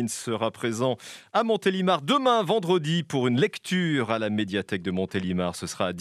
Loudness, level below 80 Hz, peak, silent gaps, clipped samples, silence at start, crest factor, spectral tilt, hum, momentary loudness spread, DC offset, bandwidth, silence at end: -26 LUFS; -70 dBFS; -8 dBFS; none; under 0.1%; 0 s; 18 dB; -5 dB/octave; none; 7 LU; under 0.1%; 14.5 kHz; 0 s